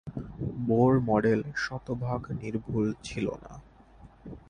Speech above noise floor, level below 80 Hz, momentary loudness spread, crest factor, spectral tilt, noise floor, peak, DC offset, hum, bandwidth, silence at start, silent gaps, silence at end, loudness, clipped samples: 25 dB; -52 dBFS; 19 LU; 20 dB; -7.5 dB/octave; -53 dBFS; -10 dBFS; under 0.1%; none; 10 kHz; 0.05 s; none; 0.1 s; -29 LUFS; under 0.1%